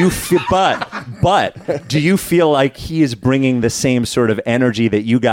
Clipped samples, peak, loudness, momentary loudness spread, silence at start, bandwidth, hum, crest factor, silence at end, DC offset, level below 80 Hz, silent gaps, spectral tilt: under 0.1%; -4 dBFS; -15 LUFS; 5 LU; 0 s; 17 kHz; none; 12 dB; 0 s; under 0.1%; -40 dBFS; none; -5.5 dB/octave